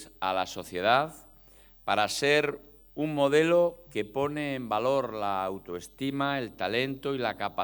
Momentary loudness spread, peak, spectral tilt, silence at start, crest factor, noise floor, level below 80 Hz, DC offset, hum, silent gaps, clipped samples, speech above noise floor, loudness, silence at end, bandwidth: 11 LU; -8 dBFS; -4.5 dB/octave; 0 s; 20 dB; -55 dBFS; -62 dBFS; under 0.1%; none; none; under 0.1%; 27 dB; -28 LUFS; 0 s; 19 kHz